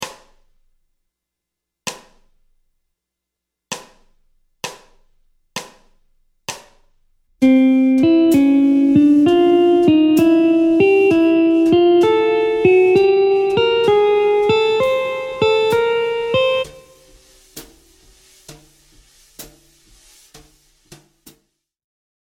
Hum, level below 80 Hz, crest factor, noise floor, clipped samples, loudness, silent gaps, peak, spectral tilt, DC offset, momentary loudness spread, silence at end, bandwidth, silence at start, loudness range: none; -52 dBFS; 16 dB; -82 dBFS; under 0.1%; -14 LUFS; none; 0 dBFS; -5.5 dB/octave; under 0.1%; 19 LU; 2.8 s; 16.5 kHz; 0 s; 23 LU